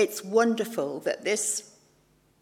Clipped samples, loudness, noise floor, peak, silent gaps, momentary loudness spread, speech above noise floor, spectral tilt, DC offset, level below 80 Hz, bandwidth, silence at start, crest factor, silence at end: under 0.1%; -27 LUFS; -64 dBFS; -10 dBFS; none; 6 LU; 38 dB; -3 dB/octave; under 0.1%; -76 dBFS; 16 kHz; 0 s; 18 dB; 0.75 s